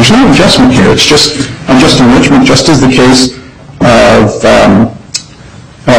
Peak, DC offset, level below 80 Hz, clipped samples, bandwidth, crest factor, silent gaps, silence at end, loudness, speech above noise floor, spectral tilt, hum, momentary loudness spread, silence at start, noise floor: 0 dBFS; under 0.1%; -26 dBFS; 1%; 15.5 kHz; 6 dB; none; 0 s; -5 LUFS; 26 dB; -4.5 dB/octave; none; 8 LU; 0 s; -30 dBFS